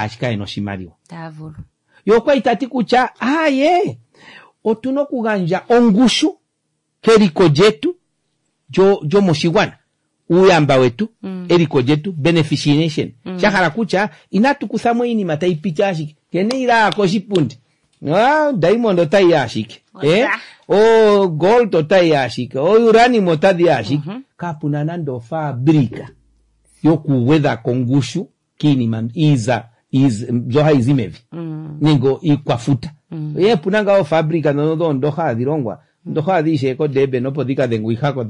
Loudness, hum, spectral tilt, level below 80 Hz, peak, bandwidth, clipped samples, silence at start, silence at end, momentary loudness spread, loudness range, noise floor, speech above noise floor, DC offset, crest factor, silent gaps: -15 LUFS; none; -6.5 dB/octave; -52 dBFS; -2 dBFS; 11 kHz; under 0.1%; 0 s; 0 s; 12 LU; 4 LU; -70 dBFS; 56 dB; under 0.1%; 14 dB; none